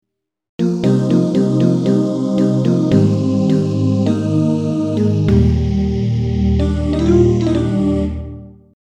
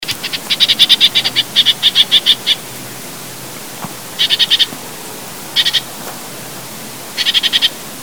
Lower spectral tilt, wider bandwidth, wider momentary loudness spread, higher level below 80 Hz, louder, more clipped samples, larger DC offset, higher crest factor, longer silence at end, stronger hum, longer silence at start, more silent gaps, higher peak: first, -8.5 dB/octave vs -0.5 dB/octave; second, 9.6 kHz vs over 20 kHz; second, 4 LU vs 19 LU; first, -28 dBFS vs -56 dBFS; second, -15 LUFS vs -10 LUFS; second, under 0.1% vs 0.3%; second, under 0.1% vs 1%; about the same, 14 dB vs 16 dB; first, 0.45 s vs 0 s; neither; first, 0.6 s vs 0 s; neither; about the same, 0 dBFS vs 0 dBFS